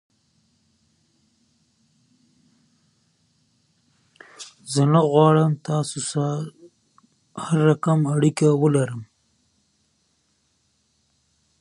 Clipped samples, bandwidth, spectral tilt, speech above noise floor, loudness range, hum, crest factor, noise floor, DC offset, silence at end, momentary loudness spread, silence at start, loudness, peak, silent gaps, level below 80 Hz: under 0.1%; 11 kHz; -6.5 dB/octave; 49 dB; 5 LU; none; 22 dB; -68 dBFS; under 0.1%; 2.55 s; 21 LU; 4.4 s; -20 LUFS; -4 dBFS; none; -68 dBFS